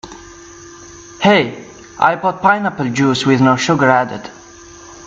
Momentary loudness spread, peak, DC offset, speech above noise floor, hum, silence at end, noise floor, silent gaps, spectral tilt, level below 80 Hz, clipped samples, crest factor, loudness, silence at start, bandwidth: 23 LU; 0 dBFS; under 0.1%; 25 dB; none; 0 s; -38 dBFS; none; -5 dB/octave; -52 dBFS; under 0.1%; 16 dB; -14 LUFS; 0.05 s; 7.8 kHz